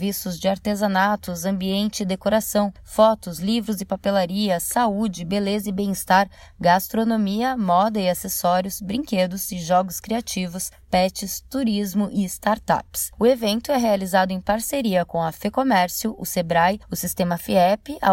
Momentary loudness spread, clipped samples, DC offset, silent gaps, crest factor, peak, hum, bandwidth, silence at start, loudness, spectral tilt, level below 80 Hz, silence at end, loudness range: 7 LU; under 0.1%; under 0.1%; none; 18 dB; -4 dBFS; none; 16.5 kHz; 0 s; -22 LUFS; -4.5 dB/octave; -48 dBFS; 0 s; 3 LU